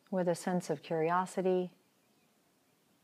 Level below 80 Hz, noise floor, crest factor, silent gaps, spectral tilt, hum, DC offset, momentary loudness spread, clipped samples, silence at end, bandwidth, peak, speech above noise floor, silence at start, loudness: under -90 dBFS; -72 dBFS; 16 dB; none; -6.5 dB/octave; none; under 0.1%; 4 LU; under 0.1%; 1.35 s; 15 kHz; -18 dBFS; 39 dB; 0.1 s; -34 LUFS